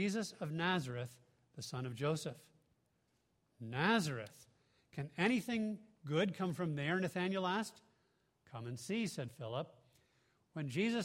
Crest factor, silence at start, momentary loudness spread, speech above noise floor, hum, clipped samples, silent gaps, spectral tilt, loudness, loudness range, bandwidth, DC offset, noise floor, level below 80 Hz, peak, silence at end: 22 dB; 0 s; 15 LU; 41 dB; none; under 0.1%; none; -5.5 dB/octave; -39 LUFS; 5 LU; 16 kHz; under 0.1%; -79 dBFS; -78 dBFS; -18 dBFS; 0 s